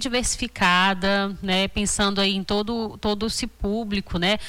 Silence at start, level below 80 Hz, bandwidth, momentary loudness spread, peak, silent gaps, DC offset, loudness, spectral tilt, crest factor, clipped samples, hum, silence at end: 0 s; -38 dBFS; 19 kHz; 8 LU; -10 dBFS; none; under 0.1%; -23 LUFS; -3.5 dB/octave; 14 dB; under 0.1%; none; 0 s